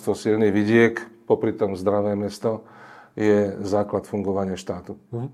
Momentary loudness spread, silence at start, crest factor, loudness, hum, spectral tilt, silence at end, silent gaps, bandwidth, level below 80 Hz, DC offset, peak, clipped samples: 15 LU; 0 s; 18 dB; -23 LUFS; none; -7 dB/octave; 0 s; none; 13.5 kHz; -64 dBFS; under 0.1%; -4 dBFS; under 0.1%